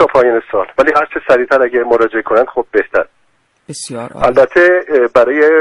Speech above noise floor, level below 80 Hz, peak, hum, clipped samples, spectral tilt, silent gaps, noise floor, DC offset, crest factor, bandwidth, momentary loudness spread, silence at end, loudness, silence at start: 46 dB; -44 dBFS; 0 dBFS; none; under 0.1%; -5 dB/octave; none; -57 dBFS; under 0.1%; 12 dB; 11.5 kHz; 14 LU; 0 s; -11 LUFS; 0 s